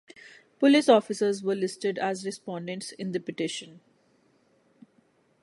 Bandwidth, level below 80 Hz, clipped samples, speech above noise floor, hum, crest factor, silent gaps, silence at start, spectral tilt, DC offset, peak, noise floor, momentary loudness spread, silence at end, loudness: 11.5 kHz; -80 dBFS; under 0.1%; 40 dB; none; 22 dB; none; 0.25 s; -4.5 dB/octave; under 0.1%; -6 dBFS; -66 dBFS; 15 LU; 1.65 s; -27 LUFS